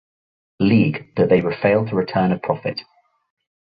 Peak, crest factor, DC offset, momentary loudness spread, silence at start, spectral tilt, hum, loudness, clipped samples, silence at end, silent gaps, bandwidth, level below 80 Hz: -4 dBFS; 16 dB; under 0.1%; 8 LU; 0.6 s; -10.5 dB/octave; none; -19 LUFS; under 0.1%; 0.9 s; none; 5 kHz; -52 dBFS